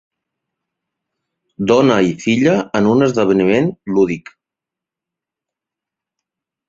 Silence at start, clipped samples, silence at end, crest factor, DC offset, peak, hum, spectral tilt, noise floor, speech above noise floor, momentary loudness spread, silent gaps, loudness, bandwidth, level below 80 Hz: 1.6 s; under 0.1%; 2.5 s; 18 dB; under 0.1%; 0 dBFS; none; -6.5 dB/octave; -85 dBFS; 72 dB; 5 LU; none; -15 LUFS; 7.8 kHz; -54 dBFS